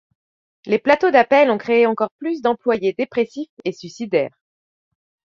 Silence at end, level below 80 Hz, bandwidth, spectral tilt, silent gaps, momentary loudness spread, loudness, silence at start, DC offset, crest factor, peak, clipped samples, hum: 1.05 s; -64 dBFS; 7.4 kHz; -5.5 dB/octave; 2.11-2.19 s, 3.49-3.57 s; 14 LU; -18 LUFS; 0.65 s; under 0.1%; 18 dB; -2 dBFS; under 0.1%; none